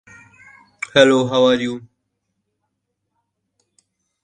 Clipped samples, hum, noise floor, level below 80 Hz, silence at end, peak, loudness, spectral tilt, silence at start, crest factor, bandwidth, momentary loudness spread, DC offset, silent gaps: under 0.1%; none; -75 dBFS; -60 dBFS; 2.45 s; 0 dBFS; -15 LUFS; -4.5 dB/octave; 0.95 s; 22 dB; 9.6 kHz; 17 LU; under 0.1%; none